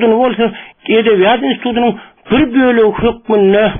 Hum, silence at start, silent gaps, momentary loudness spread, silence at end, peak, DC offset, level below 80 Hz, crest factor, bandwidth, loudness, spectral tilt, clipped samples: none; 0 s; none; 7 LU; 0 s; 0 dBFS; under 0.1%; -40 dBFS; 10 dB; 3.8 kHz; -12 LUFS; -4 dB/octave; under 0.1%